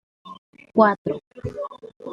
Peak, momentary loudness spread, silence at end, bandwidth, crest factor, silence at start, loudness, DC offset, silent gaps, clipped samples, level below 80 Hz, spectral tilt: -2 dBFS; 26 LU; 0 s; 7 kHz; 24 dB; 0.25 s; -22 LUFS; under 0.1%; 0.38-0.53 s, 0.98-1.05 s, 1.27-1.31 s, 1.96-2.00 s; under 0.1%; -56 dBFS; -8.5 dB/octave